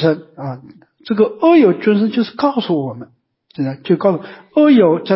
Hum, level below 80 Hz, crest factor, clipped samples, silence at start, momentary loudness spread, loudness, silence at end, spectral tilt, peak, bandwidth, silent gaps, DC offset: none; -62 dBFS; 14 dB; under 0.1%; 0 s; 17 LU; -15 LUFS; 0 s; -11.5 dB/octave; -2 dBFS; 5.8 kHz; none; under 0.1%